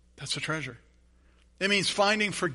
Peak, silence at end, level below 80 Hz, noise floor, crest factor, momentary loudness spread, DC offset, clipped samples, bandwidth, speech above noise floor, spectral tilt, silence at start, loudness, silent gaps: -10 dBFS; 0 s; -60 dBFS; -61 dBFS; 20 dB; 10 LU; under 0.1%; under 0.1%; 11.5 kHz; 33 dB; -3 dB/octave; 0.2 s; -27 LUFS; none